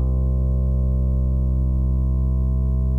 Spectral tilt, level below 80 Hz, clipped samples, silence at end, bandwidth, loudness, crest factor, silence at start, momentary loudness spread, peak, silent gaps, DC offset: -12.5 dB/octave; -20 dBFS; under 0.1%; 0 s; 1.3 kHz; -22 LUFS; 8 dB; 0 s; 0 LU; -12 dBFS; none; under 0.1%